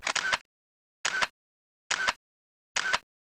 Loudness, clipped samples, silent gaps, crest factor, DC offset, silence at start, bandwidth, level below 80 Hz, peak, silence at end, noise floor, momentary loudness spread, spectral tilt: -30 LUFS; under 0.1%; 0.41-1.04 s, 1.30-1.90 s, 2.16-2.75 s; 20 dB; under 0.1%; 0 s; 16.5 kHz; -66 dBFS; -14 dBFS; 0.2 s; under -90 dBFS; 5 LU; 1 dB/octave